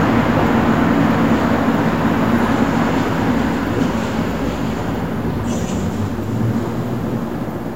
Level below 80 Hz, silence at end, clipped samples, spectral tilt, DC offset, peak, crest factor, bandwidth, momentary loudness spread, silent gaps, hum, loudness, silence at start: -34 dBFS; 0 s; under 0.1%; -7 dB/octave; 2%; -2 dBFS; 14 dB; 16 kHz; 7 LU; none; none; -18 LUFS; 0 s